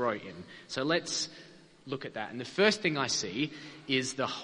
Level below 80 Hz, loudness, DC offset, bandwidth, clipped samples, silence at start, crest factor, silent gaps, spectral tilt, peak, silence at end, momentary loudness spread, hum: -70 dBFS; -31 LUFS; under 0.1%; 10.5 kHz; under 0.1%; 0 s; 24 dB; none; -3 dB/octave; -8 dBFS; 0 s; 15 LU; none